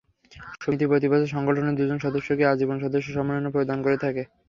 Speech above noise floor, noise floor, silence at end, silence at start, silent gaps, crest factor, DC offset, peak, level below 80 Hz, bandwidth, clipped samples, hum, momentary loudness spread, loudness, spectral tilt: 22 dB; -46 dBFS; 0.25 s; 0.35 s; none; 18 dB; under 0.1%; -6 dBFS; -58 dBFS; 7.2 kHz; under 0.1%; none; 7 LU; -24 LUFS; -8 dB/octave